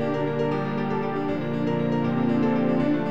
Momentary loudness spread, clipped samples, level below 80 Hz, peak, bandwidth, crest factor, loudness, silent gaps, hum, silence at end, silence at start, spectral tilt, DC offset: 4 LU; under 0.1%; -54 dBFS; -12 dBFS; 7.4 kHz; 12 dB; -25 LUFS; none; none; 0 s; 0 s; -9 dB/octave; 1%